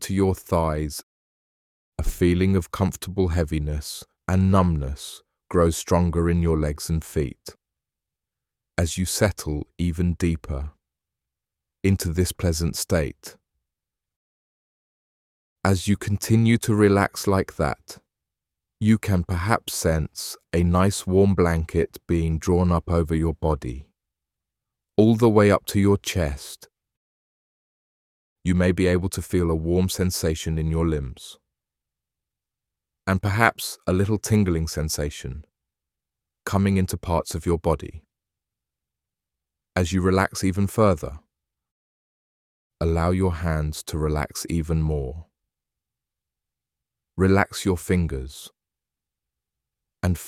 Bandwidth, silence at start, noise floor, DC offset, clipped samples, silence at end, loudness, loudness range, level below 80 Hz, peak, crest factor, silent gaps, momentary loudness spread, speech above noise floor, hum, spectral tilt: 16 kHz; 0 s; -88 dBFS; under 0.1%; under 0.1%; 0 s; -23 LUFS; 5 LU; -38 dBFS; -2 dBFS; 22 dB; 1.03-1.92 s, 14.16-15.56 s, 26.97-28.36 s, 41.71-42.70 s; 13 LU; 66 dB; none; -6 dB/octave